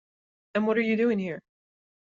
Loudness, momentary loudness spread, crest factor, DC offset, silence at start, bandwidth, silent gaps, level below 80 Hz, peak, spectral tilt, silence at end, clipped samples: -27 LUFS; 11 LU; 16 dB; under 0.1%; 0.55 s; 7.2 kHz; none; -74 dBFS; -12 dBFS; -5.5 dB/octave; 0.75 s; under 0.1%